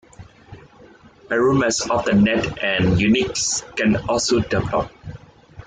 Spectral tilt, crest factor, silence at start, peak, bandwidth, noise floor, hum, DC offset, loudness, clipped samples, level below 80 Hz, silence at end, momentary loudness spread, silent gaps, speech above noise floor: -4.5 dB/octave; 14 dB; 0.2 s; -6 dBFS; 9.6 kHz; -47 dBFS; none; under 0.1%; -19 LUFS; under 0.1%; -42 dBFS; 0.05 s; 8 LU; none; 29 dB